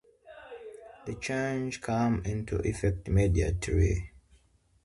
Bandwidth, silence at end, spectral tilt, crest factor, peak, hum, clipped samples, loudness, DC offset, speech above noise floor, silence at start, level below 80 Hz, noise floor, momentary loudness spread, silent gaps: 11.5 kHz; 0.75 s; -6.5 dB/octave; 16 dB; -14 dBFS; none; under 0.1%; -30 LUFS; under 0.1%; 36 dB; 0.25 s; -38 dBFS; -65 dBFS; 19 LU; none